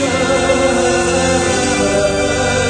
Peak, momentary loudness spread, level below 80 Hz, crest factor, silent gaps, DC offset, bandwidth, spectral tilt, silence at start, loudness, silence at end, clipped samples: -2 dBFS; 2 LU; -32 dBFS; 12 dB; none; under 0.1%; 10 kHz; -3.5 dB/octave; 0 s; -14 LUFS; 0 s; under 0.1%